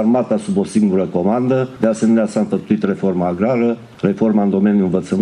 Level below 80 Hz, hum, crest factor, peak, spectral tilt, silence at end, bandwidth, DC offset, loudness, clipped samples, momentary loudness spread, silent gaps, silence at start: -56 dBFS; none; 14 dB; 0 dBFS; -8 dB/octave; 0 s; 10.5 kHz; under 0.1%; -16 LUFS; under 0.1%; 4 LU; none; 0 s